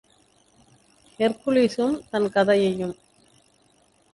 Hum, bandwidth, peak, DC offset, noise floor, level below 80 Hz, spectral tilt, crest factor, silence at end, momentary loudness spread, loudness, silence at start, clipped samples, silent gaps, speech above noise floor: 50 Hz at -50 dBFS; 11.5 kHz; -8 dBFS; under 0.1%; -62 dBFS; -62 dBFS; -6 dB/octave; 18 dB; 1.2 s; 10 LU; -23 LUFS; 1.2 s; under 0.1%; none; 40 dB